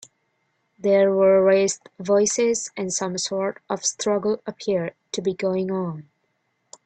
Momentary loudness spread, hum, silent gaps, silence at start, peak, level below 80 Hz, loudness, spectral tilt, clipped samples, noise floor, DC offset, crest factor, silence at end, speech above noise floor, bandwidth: 11 LU; none; none; 0.85 s; -6 dBFS; -68 dBFS; -22 LUFS; -4 dB/octave; under 0.1%; -72 dBFS; under 0.1%; 16 dB; 0.85 s; 50 dB; 9.2 kHz